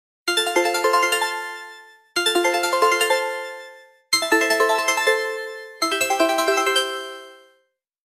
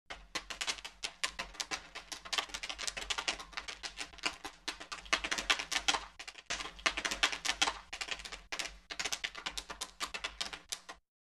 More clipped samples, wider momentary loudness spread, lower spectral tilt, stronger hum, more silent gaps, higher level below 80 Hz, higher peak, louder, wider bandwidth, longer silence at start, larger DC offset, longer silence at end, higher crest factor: neither; first, 15 LU vs 11 LU; about the same, 0 dB/octave vs 0.5 dB/octave; neither; neither; second, -70 dBFS vs -60 dBFS; first, -4 dBFS vs -12 dBFS; first, -20 LUFS vs -37 LUFS; about the same, 14.5 kHz vs 13.5 kHz; first, 0.25 s vs 0.1 s; neither; first, 0.7 s vs 0.3 s; second, 18 dB vs 28 dB